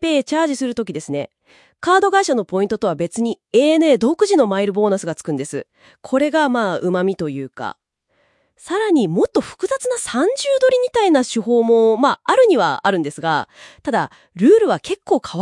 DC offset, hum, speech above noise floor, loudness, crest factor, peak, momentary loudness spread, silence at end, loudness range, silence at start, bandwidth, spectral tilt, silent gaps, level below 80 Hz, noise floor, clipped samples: under 0.1%; none; 47 dB; -17 LUFS; 18 dB; 0 dBFS; 12 LU; 0 s; 6 LU; 0 s; 12 kHz; -5 dB/octave; none; -60 dBFS; -64 dBFS; under 0.1%